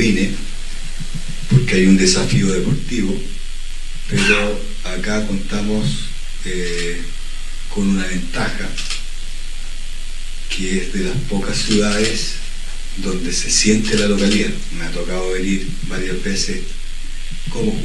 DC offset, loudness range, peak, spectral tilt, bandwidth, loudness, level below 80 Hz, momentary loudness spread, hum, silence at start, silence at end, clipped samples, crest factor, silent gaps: under 0.1%; 7 LU; 0 dBFS; -4 dB/octave; 11.5 kHz; -19 LUFS; -22 dBFS; 18 LU; none; 0 s; 0 s; under 0.1%; 16 dB; none